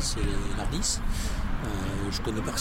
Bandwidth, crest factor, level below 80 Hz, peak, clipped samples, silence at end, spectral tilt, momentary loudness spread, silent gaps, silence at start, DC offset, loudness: 16 kHz; 14 dB; -32 dBFS; -14 dBFS; under 0.1%; 0 s; -4 dB/octave; 4 LU; none; 0 s; under 0.1%; -31 LUFS